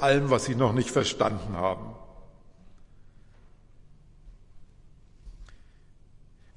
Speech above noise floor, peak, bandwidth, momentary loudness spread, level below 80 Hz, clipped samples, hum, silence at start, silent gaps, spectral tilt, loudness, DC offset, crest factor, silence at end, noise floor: 28 dB; -10 dBFS; 11.5 kHz; 15 LU; -50 dBFS; under 0.1%; none; 0 s; none; -5 dB/octave; -26 LUFS; under 0.1%; 22 dB; 1 s; -54 dBFS